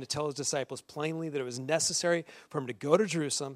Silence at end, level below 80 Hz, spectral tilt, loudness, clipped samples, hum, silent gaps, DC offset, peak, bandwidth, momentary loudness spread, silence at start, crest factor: 0 s; -72 dBFS; -3.5 dB/octave; -31 LUFS; under 0.1%; none; none; under 0.1%; -10 dBFS; 15.5 kHz; 10 LU; 0 s; 22 dB